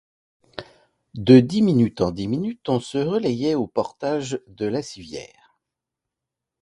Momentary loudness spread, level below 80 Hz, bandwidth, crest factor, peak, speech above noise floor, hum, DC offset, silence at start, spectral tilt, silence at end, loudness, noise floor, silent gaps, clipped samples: 23 LU; -54 dBFS; 11 kHz; 22 dB; 0 dBFS; 65 dB; none; under 0.1%; 0.6 s; -7 dB/octave; 1.35 s; -21 LUFS; -85 dBFS; none; under 0.1%